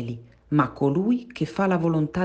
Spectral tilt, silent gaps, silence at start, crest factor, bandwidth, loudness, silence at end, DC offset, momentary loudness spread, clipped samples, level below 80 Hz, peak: -8.5 dB/octave; none; 0 s; 16 dB; 8.4 kHz; -24 LUFS; 0 s; under 0.1%; 9 LU; under 0.1%; -54 dBFS; -6 dBFS